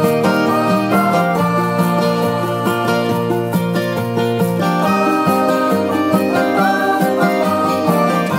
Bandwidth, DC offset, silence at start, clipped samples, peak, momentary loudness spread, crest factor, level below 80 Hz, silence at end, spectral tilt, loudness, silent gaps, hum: 16.5 kHz; under 0.1%; 0 s; under 0.1%; 0 dBFS; 3 LU; 14 dB; -56 dBFS; 0 s; -6.5 dB/octave; -15 LUFS; none; none